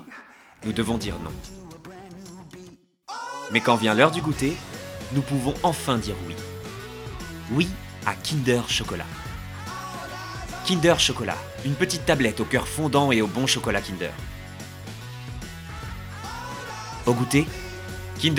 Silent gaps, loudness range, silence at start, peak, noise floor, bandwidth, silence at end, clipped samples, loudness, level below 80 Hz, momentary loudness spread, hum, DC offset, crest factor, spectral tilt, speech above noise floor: none; 7 LU; 0 s; 0 dBFS; -48 dBFS; 18.5 kHz; 0 s; under 0.1%; -25 LUFS; -44 dBFS; 18 LU; none; under 0.1%; 26 dB; -4.5 dB/octave; 25 dB